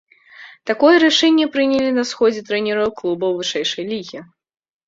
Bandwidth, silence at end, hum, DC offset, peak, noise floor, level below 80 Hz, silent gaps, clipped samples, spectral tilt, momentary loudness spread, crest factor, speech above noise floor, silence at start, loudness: 7.8 kHz; 0.65 s; none; under 0.1%; -2 dBFS; -43 dBFS; -60 dBFS; none; under 0.1%; -3.5 dB/octave; 14 LU; 16 dB; 26 dB; 0.4 s; -17 LUFS